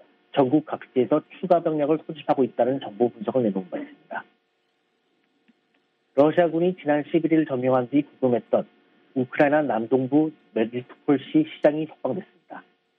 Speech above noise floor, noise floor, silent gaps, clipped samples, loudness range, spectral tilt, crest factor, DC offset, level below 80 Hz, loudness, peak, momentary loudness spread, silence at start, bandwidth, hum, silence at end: 48 dB; -71 dBFS; none; under 0.1%; 5 LU; -9.5 dB/octave; 20 dB; under 0.1%; -74 dBFS; -23 LUFS; -4 dBFS; 14 LU; 0.35 s; 4.4 kHz; none; 0.4 s